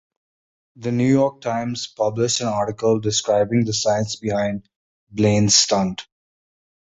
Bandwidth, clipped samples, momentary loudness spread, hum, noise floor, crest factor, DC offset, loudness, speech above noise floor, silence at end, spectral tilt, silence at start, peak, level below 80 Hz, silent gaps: 8.2 kHz; under 0.1%; 12 LU; none; under -90 dBFS; 18 dB; under 0.1%; -20 LUFS; over 70 dB; 0.85 s; -4 dB/octave; 0.8 s; -2 dBFS; -52 dBFS; 4.76-5.07 s